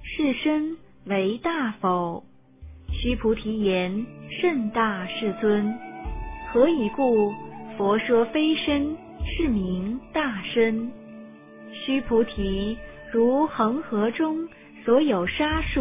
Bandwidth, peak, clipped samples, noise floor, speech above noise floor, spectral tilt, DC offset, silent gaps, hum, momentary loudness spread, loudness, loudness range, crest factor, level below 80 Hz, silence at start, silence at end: 3.8 kHz; -6 dBFS; under 0.1%; -46 dBFS; 22 dB; -10 dB/octave; under 0.1%; none; none; 14 LU; -24 LUFS; 3 LU; 18 dB; -40 dBFS; 0 s; 0 s